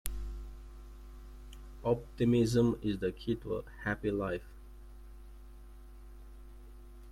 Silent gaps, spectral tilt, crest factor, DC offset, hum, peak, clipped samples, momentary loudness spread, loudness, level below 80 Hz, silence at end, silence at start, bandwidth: none; -6.5 dB/octave; 22 dB; under 0.1%; none; -14 dBFS; under 0.1%; 26 LU; -34 LUFS; -48 dBFS; 0 s; 0.05 s; 15.5 kHz